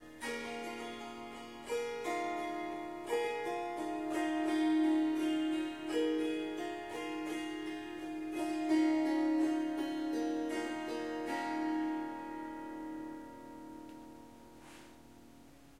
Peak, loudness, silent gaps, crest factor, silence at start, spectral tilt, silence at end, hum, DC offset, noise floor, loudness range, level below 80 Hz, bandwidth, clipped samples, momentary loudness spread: -22 dBFS; -37 LUFS; none; 14 dB; 0 s; -4 dB/octave; 0 s; none; under 0.1%; -59 dBFS; 7 LU; -70 dBFS; 13.5 kHz; under 0.1%; 18 LU